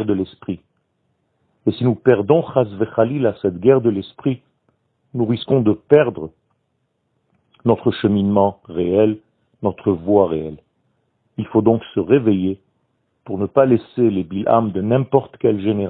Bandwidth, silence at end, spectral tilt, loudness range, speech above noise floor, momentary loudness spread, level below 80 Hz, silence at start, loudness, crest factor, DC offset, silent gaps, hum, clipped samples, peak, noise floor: 4.5 kHz; 0 s; -12 dB/octave; 2 LU; 53 dB; 14 LU; -54 dBFS; 0 s; -18 LUFS; 18 dB; under 0.1%; none; none; under 0.1%; 0 dBFS; -69 dBFS